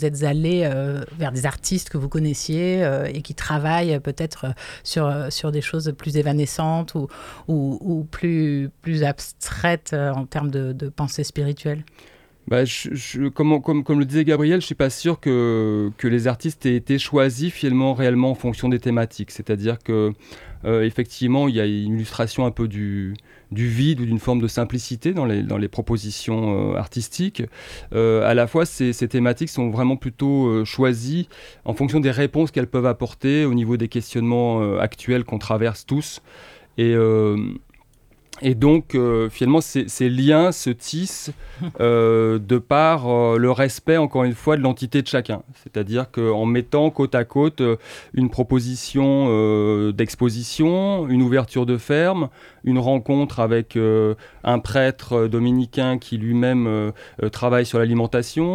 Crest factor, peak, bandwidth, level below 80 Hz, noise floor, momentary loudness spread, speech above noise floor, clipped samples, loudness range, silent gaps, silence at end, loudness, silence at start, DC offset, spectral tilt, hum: 16 dB; -4 dBFS; 15.5 kHz; -46 dBFS; -55 dBFS; 9 LU; 35 dB; under 0.1%; 5 LU; none; 0 s; -21 LUFS; 0 s; under 0.1%; -6.5 dB/octave; none